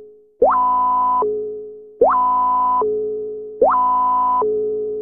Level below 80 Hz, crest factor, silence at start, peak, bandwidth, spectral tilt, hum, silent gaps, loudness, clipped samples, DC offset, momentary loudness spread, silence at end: -50 dBFS; 14 dB; 0 s; -4 dBFS; 3.2 kHz; -10 dB/octave; none; none; -17 LUFS; under 0.1%; under 0.1%; 11 LU; 0 s